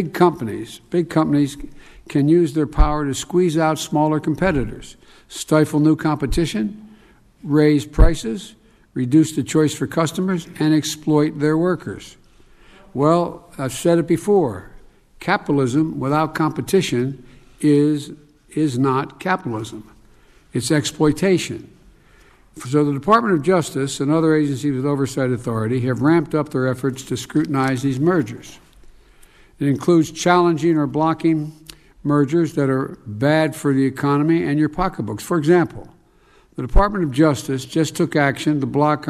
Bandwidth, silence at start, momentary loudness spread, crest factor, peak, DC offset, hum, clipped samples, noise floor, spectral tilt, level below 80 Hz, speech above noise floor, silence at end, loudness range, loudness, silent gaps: 14.5 kHz; 0 s; 12 LU; 16 dB; -2 dBFS; under 0.1%; none; under 0.1%; -53 dBFS; -6.5 dB/octave; -32 dBFS; 35 dB; 0 s; 3 LU; -19 LUFS; none